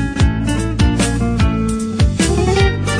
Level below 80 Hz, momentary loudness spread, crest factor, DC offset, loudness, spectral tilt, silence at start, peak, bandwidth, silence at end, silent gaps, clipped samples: -20 dBFS; 4 LU; 12 dB; under 0.1%; -16 LUFS; -5.5 dB/octave; 0 s; -4 dBFS; 10.5 kHz; 0 s; none; under 0.1%